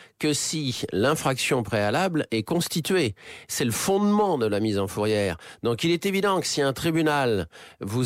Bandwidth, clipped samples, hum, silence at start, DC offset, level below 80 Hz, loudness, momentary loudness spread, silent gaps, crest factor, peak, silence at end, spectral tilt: 16 kHz; under 0.1%; none; 0 s; under 0.1%; -56 dBFS; -24 LUFS; 7 LU; none; 14 dB; -12 dBFS; 0 s; -4.5 dB/octave